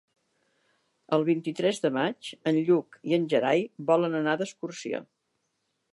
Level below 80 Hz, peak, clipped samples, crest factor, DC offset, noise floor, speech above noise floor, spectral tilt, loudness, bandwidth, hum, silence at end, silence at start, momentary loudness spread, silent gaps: -82 dBFS; -10 dBFS; under 0.1%; 18 dB; under 0.1%; -77 dBFS; 51 dB; -6 dB/octave; -27 LUFS; 11.5 kHz; none; 0.9 s; 1.1 s; 10 LU; none